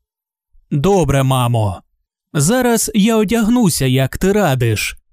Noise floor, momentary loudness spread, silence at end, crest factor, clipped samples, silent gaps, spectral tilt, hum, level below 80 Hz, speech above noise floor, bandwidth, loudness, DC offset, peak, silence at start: -80 dBFS; 6 LU; 0.15 s; 12 dB; under 0.1%; none; -5.5 dB/octave; none; -36 dBFS; 67 dB; 16 kHz; -15 LUFS; under 0.1%; -2 dBFS; 0.7 s